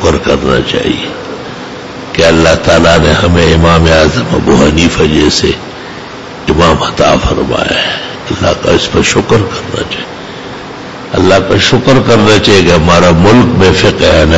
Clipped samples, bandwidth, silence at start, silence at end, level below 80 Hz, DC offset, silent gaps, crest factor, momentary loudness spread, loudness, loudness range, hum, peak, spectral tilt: 0.6%; 11 kHz; 0 s; 0 s; -24 dBFS; under 0.1%; none; 8 dB; 17 LU; -8 LUFS; 5 LU; none; 0 dBFS; -5 dB/octave